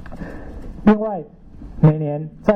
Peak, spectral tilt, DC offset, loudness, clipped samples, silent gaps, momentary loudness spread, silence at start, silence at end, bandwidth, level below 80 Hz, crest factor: -4 dBFS; -10.5 dB/octave; under 0.1%; -18 LUFS; under 0.1%; none; 20 LU; 0 s; 0 s; 4.5 kHz; -38 dBFS; 16 dB